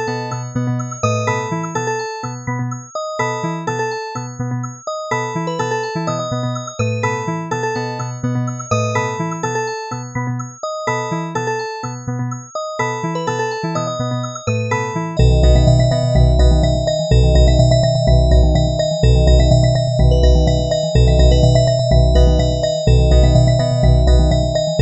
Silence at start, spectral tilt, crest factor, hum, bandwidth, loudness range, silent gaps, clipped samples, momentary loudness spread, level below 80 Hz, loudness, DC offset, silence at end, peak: 0 s; -6 dB/octave; 14 dB; none; 8.4 kHz; 9 LU; none; under 0.1%; 11 LU; -20 dBFS; -17 LUFS; under 0.1%; 0 s; 0 dBFS